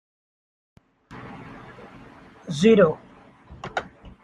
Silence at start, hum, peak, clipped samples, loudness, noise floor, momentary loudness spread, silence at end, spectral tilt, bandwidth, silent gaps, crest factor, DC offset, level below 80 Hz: 1.1 s; none; -4 dBFS; under 0.1%; -21 LUFS; -49 dBFS; 28 LU; 0.15 s; -6.5 dB/octave; 10.5 kHz; none; 22 dB; under 0.1%; -56 dBFS